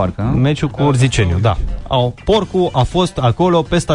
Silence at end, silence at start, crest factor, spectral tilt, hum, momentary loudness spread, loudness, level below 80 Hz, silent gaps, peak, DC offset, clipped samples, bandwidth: 0 s; 0 s; 12 dB; -6.5 dB/octave; none; 4 LU; -15 LUFS; -28 dBFS; none; -2 dBFS; under 0.1%; under 0.1%; 11 kHz